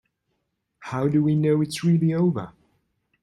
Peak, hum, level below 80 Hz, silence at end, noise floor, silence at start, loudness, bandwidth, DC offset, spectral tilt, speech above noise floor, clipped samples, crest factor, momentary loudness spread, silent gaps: -10 dBFS; none; -62 dBFS; 0.75 s; -76 dBFS; 0.8 s; -22 LUFS; 12 kHz; under 0.1%; -7.5 dB/octave; 55 dB; under 0.1%; 14 dB; 13 LU; none